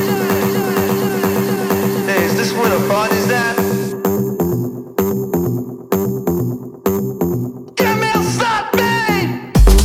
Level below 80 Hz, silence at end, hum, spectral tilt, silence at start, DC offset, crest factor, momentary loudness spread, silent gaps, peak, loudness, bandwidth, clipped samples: -24 dBFS; 0 s; none; -5.5 dB/octave; 0 s; under 0.1%; 16 dB; 6 LU; none; 0 dBFS; -17 LUFS; 17.5 kHz; under 0.1%